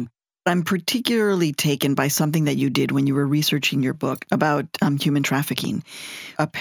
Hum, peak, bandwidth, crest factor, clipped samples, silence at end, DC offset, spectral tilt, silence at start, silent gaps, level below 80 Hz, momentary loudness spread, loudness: none; -2 dBFS; 19.5 kHz; 20 dB; under 0.1%; 0 s; under 0.1%; -5 dB/octave; 0 s; none; -66 dBFS; 7 LU; -21 LUFS